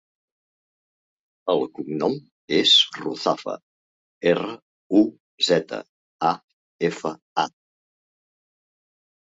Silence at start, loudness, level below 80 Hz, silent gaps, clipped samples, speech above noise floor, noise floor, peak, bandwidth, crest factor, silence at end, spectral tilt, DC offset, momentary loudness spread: 1.45 s; -22 LUFS; -70 dBFS; 2.32-2.48 s, 3.63-4.21 s, 4.62-4.90 s, 5.20-5.38 s, 5.89-6.19 s, 6.44-6.79 s, 7.22-7.36 s; under 0.1%; over 68 dB; under -90 dBFS; -6 dBFS; 8 kHz; 20 dB; 1.7 s; -4 dB/octave; under 0.1%; 18 LU